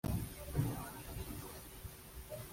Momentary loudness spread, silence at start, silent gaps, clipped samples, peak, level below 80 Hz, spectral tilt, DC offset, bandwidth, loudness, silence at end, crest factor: 12 LU; 0.05 s; none; under 0.1%; -24 dBFS; -52 dBFS; -5.5 dB/octave; under 0.1%; 16.5 kHz; -44 LUFS; 0 s; 20 dB